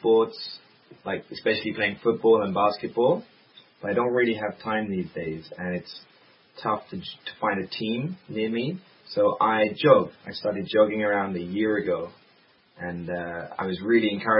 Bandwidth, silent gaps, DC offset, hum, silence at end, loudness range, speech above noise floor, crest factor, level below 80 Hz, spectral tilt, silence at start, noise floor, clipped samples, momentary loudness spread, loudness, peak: 5.6 kHz; none; under 0.1%; none; 0 s; 7 LU; 35 dB; 22 dB; -64 dBFS; -10.5 dB/octave; 0 s; -60 dBFS; under 0.1%; 14 LU; -25 LUFS; -2 dBFS